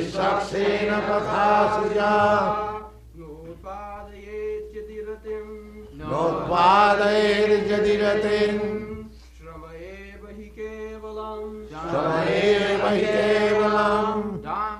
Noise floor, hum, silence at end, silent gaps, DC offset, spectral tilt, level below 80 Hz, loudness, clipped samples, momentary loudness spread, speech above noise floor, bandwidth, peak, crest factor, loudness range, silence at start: -43 dBFS; none; 0 s; none; under 0.1%; -5.5 dB/octave; -46 dBFS; -21 LUFS; under 0.1%; 21 LU; 23 dB; 11.5 kHz; -6 dBFS; 18 dB; 13 LU; 0 s